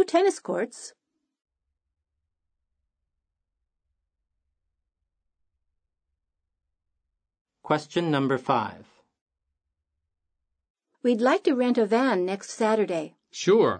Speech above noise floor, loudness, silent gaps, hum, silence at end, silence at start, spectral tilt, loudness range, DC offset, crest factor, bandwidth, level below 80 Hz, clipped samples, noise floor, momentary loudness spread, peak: 59 dB; -25 LUFS; 7.41-7.45 s, 9.21-9.26 s, 10.70-10.75 s; none; 0 s; 0 s; -5.5 dB/octave; 9 LU; under 0.1%; 20 dB; 9.6 kHz; -78 dBFS; under 0.1%; -83 dBFS; 10 LU; -8 dBFS